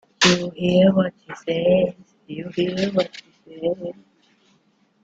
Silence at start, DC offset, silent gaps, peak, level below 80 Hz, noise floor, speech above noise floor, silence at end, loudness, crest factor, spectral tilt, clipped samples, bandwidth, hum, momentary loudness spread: 0.2 s; under 0.1%; none; -2 dBFS; -58 dBFS; -62 dBFS; 41 dB; 1.1 s; -21 LUFS; 20 dB; -5 dB/octave; under 0.1%; 7.8 kHz; none; 17 LU